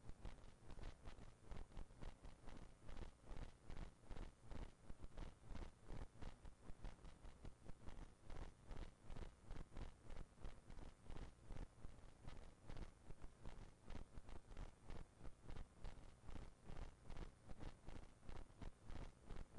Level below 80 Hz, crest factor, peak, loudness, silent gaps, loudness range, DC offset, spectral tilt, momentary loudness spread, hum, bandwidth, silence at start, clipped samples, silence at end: -58 dBFS; 12 dB; -42 dBFS; -62 LUFS; none; 2 LU; under 0.1%; -6 dB/octave; 4 LU; none; 11 kHz; 0 s; under 0.1%; 0 s